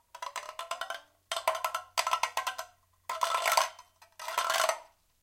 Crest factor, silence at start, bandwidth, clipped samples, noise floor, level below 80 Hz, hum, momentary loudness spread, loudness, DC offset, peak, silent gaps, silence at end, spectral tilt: 24 dB; 0.15 s; 17 kHz; under 0.1%; -56 dBFS; -76 dBFS; none; 14 LU; -32 LUFS; under 0.1%; -10 dBFS; none; 0.4 s; 2 dB/octave